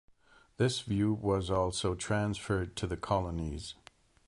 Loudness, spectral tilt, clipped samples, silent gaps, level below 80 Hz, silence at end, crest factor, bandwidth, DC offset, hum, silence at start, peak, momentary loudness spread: -33 LUFS; -5.5 dB/octave; under 0.1%; none; -48 dBFS; 0.55 s; 18 dB; 11.5 kHz; under 0.1%; none; 0.6 s; -16 dBFS; 8 LU